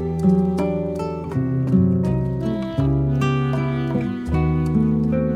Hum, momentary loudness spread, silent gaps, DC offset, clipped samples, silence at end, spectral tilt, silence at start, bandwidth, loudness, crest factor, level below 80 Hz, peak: none; 6 LU; none; under 0.1%; under 0.1%; 0 s; -9 dB/octave; 0 s; 9.4 kHz; -21 LUFS; 14 dB; -34 dBFS; -6 dBFS